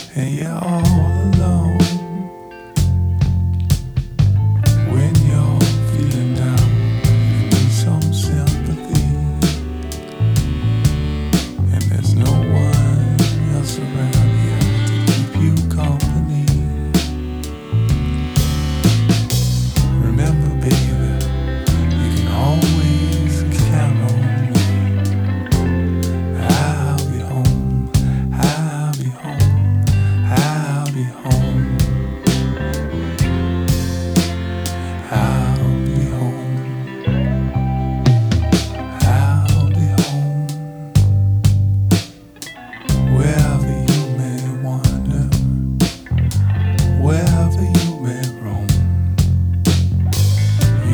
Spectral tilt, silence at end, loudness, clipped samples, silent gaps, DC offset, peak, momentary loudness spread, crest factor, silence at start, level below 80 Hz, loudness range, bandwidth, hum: -6.5 dB/octave; 0 s; -17 LUFS; under 0.1%; none; under 0.1%; 0 dBFS; 7 LU; 16 dB; 0 s; -26 dBFS; 3 LU; over 20 kHz; none